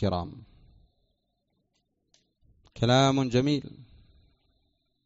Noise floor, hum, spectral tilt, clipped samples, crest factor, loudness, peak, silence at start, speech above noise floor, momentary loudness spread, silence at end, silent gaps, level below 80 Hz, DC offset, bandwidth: -77 dBFS; none; -5.5 dB/octave; under 0.1%; 22 dB; -25 LUFS; -10 dBFS; 0 s; 51 dB; 17 LU; 1.2 s; none; -56 dBFS; under 0.1%; 8 kHz